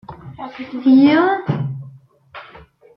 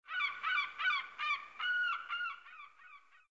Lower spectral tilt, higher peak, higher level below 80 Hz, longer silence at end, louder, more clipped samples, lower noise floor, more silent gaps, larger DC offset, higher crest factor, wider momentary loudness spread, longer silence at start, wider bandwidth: first, -9.5 dB/octave vs 6.5 dB/octave; first, -2 dBFS vs -24 dBFS; first, -56 dBFS vs -84 dBFS; first, 0.55 s vs 0.35 s; first, -15 LUFS vs -35 LUFS; neither; second, -44 dBFS vs -60 dBFS; neither; neither; about the same, 16 dB vs 14 dB; first, 26 LU vs 18 LU; about the same, 0.1 s vs 0.05 s; second, 5.8 kHz vs 7.6 kHz